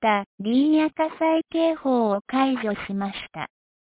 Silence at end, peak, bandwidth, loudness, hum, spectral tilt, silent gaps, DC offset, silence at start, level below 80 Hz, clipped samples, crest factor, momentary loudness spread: 0.35 s; -8 dBFS; 4 kHz; -23 LUFS; none; -9.5 dB/octave; 0.26-0.38 s, 2.21-2.25 s; under 0.1%; 0 s; -62 dBFS; under 0.1%; 16 dB; 12 LU